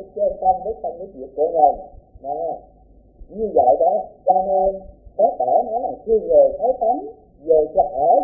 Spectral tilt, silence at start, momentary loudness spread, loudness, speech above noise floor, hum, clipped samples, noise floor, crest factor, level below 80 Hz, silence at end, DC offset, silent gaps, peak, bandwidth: -15.5 dB/octave; 0 s; 18 LU; -19 LUFS; 28 dB; none; under 0.1%; -47 dBFS; 18 dB; -48 dBFS; 0 s; under 0.1%; none; -2 dBFS; 0.9 kHz